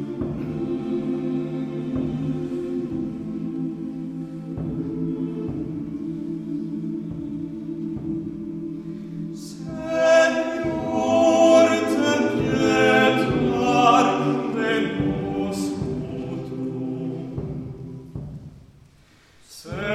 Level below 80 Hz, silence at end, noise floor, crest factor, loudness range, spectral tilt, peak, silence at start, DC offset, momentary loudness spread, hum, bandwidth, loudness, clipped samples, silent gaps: -48 dBFS; 0 s; -54 dBFS; 22 dB; 12 LU; -5.5 dB/octave; -2 dBFS; 0 s; under 0.1%; 16 LU; none; 14.5 kHz; -23 LUFS; under 0.1%; none